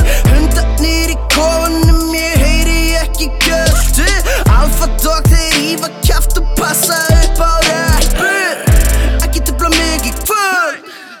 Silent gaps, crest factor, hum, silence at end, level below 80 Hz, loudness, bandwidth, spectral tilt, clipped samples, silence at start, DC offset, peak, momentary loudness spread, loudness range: none; 10 dB; none; 0.05 s; -12 dBFS; -12 LUFS; 19 kHz; -4 dB/octave; under 0.1%; 0 s; under 0.1%; 0 dBFS; 4 LU; 1 LU